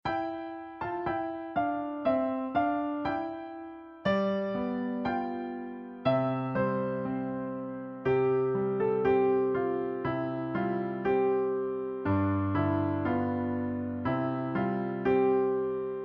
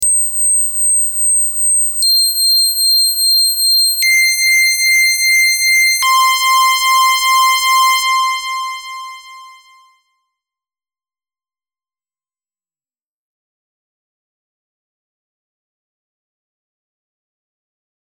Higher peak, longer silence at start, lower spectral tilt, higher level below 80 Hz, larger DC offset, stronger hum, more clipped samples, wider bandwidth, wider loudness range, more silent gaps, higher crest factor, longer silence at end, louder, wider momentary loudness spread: second, -14 dBFS vs -4 dBFS; about the same, 0.05 s vs 0 s; first, -10 dB/octave vs 8 dB/octave; about the same, -60 dBFS vs -60 dBFS; neither; neither; neither; second, 5.8 kHz vs over 20 kHz; second, 3 LU vs 9 LU; neither; about the same, 16 dB vs 12 dB; second, 0 s vs 8.55 s; second, -30 LUFS vs -10 LUFS; first, 10 LU vs 5 LU